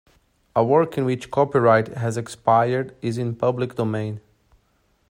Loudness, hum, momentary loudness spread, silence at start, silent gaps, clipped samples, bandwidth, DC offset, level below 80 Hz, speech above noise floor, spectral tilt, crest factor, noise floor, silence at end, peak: -22 LUFS; none; 9 LU; 0.55 s; none; under 0.1%; 15.5 kHz; under 0.1%; -60 dBFS; 44 dB; -7 dB/octave; 20 dB; -64 dBFS; 0.9 s; -2 dBFS